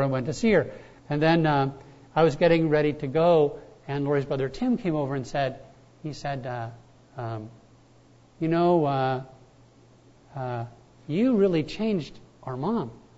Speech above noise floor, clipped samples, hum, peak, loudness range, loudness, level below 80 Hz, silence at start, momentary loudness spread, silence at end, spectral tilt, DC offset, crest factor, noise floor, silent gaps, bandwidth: 31 dB; under 0.1%; none; -8 dBFS; 8 LU; -25 LUFS; -54 dBFS; 0 s; 17 LU; 0.2 s; -7.5 dB/octave; under 0.1%; 18 dB; -56 dBFS; none; 8 kHz